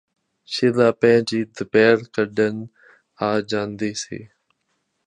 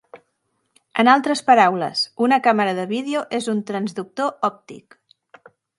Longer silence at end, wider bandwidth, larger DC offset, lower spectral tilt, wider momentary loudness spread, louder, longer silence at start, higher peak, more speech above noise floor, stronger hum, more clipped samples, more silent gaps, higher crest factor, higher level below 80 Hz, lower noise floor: second, 0.8 s vs 1 s; about the same, 10.5 kHz vs 11.5 kHz; neither; about the same, -5 dB/octave vs -4.5 dB/octave; first, 15 LU vs 11 LU; about the same, -20 LUFS vs -19 LUFS; first, 0.5 s vs 0.15 s; about the same, -2 dBFS vs 0 dBFS; about the same, 52 dB vs 52 dB; neither; neither; neither; about the same, 20 dB vs 20 dB; first, -62 dBFS vs -74 dBFS; about the same, -72 dBFS vs -71 dBFS